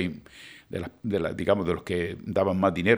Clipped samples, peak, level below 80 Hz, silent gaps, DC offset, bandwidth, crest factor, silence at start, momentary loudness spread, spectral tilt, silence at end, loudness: under 0.1%; -6 dBFS; -54 dBFS; none; under 0.1%; over 20 kHz; 22 dB; 0 s; 16 LU; -7 dB/octave; 0 s; -28 LUFS